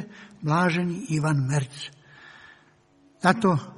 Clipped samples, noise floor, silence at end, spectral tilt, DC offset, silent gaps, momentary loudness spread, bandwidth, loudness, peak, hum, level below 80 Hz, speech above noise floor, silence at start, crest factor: under 0.1%; -59 dBFS; 0.05 s; -6 dB/octave; under 0.1%; none; 16 LU; 11.5 kHz; -25 LUFS; -2 dBFS; none; -62 dBFS; 36 dB; 0 s; 24 dB